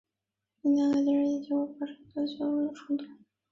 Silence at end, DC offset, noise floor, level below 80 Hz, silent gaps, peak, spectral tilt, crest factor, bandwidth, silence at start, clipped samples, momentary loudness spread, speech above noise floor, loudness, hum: 0.4 s; under 0.1%; -88 dBFS; -74 dBFS; none; -18 dBFS; -6 dB/octave; 14 dB; 7.4 kHz; 0.65 s; under 0.1%; 11 LU; 59 dB; -30 LUFS; none